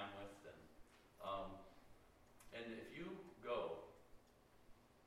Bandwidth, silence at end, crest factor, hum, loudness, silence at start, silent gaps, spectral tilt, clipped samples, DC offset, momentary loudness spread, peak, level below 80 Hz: 16 kHz; 0 s; 20 dB; none; -52 LUFS; 0 s; none; -5.5 dB/octave; under 0.1%; under 0.1%; 22 LU; -32 dBFS; -72 dBFS